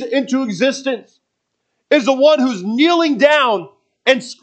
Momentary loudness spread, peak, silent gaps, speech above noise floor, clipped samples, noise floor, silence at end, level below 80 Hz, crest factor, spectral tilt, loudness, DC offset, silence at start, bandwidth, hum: 10 LU; 0 dBFS; none; 59 dB; under 0.1%; -73 dBFS; 0.1 s; -74 dBFS; 16 dB; -4 dB/octave; -15 LUFS; under 0.1%; 0 s; 8.8 kHz; none